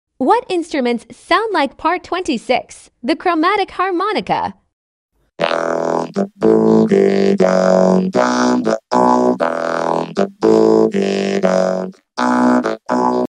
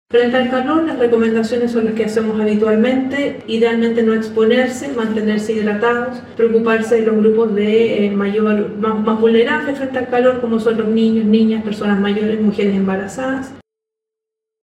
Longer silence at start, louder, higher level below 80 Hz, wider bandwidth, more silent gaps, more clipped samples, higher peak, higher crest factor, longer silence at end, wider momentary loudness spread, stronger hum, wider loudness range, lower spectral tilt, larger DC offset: about the same, 0.2 s vs 0.1 s; about the same, -15 LUFS vs -16 LUFS; about the same, -56 dBFS vs -54 dBFS; about the same, 11 kHz vs 11 kHz; first, 4.73-5.09 s vs none; neither; about the same, 0 dBFS vs -2 dBFS; about the same, 14 dB vs 14 dB; second, 0 s vs 1.05 s; about the same, 8 LU vs 6 LU; neither; first, 5 LU vs 2 LU; about the same, -6 dB/octave vs -6.5 dB/octave; neither